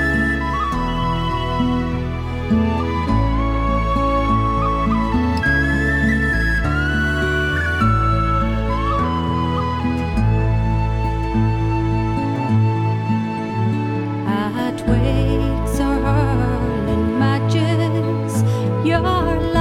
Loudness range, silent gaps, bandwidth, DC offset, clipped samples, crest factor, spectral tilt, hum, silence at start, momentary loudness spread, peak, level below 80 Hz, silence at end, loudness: 2 LU; none; 12.5 kHz; under 0.1%; under 0.1%; 14 dB; -7 dB/octave; none; 0 s; 4 LU; -4 dBFS; -26 dBFS; 0 s; -19 LUFS